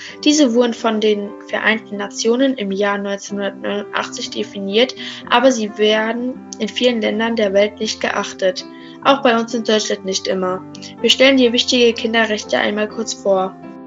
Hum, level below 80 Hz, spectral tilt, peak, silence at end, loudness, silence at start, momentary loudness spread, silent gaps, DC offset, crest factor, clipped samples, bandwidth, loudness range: none; -62 dBFS; -3 dB/octave; 0 dBFS; 0 s; -17 LUFS; 0 s; 11 LU; none; under 0.1%; 18 dB; under 0.1%; 12 kHz; 4 LU